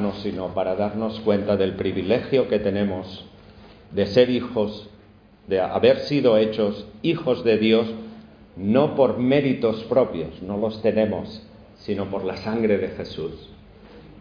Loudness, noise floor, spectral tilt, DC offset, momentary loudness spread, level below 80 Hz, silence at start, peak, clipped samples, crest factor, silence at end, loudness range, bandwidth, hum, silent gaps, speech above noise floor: -22 LUFS; -51 dBFS; -8 dB/octave; under 0.1%; 13 LU; -52 dBFS; 0 s; -4 dBFS; under 0.1%; 18 dB; 0 s; 4 LU; 5.2 kHz; none; none; 29 dB